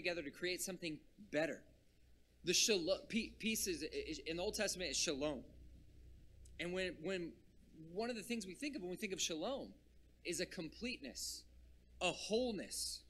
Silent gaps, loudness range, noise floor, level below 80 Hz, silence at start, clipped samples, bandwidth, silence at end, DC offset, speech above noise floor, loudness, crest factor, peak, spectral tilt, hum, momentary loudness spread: none; 6 LU; -69 dBFS; -64 dBFS; 0 s; under 0.1%; 15.5 kHz; 0 s; under 0.1%; 26 dB; -42 LUFS; 22 dB; -22 dBFS; -2.5 dB/octave; none; 11 LU